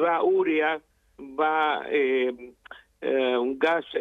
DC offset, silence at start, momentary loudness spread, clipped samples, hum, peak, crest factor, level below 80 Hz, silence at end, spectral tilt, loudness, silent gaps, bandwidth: under 0.1%; 0 s; 12 LU; under 0.1%; none; -10 dBFS; 14 dB; -68 dBFS; 0 s; -5.5 dB/octave; -25 LUFS; none; 6.2 kHz